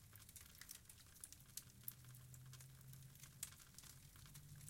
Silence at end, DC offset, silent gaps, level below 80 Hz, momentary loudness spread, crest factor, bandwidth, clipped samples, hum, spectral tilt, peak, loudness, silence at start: 0 s; under 0.1%; none; -74 dBFS; 7 LU; 34 dB; 16.5 kHz; under 0.1%; none; -2.5 dB/octave; -26 dBFS; -58 LUFS; 0 s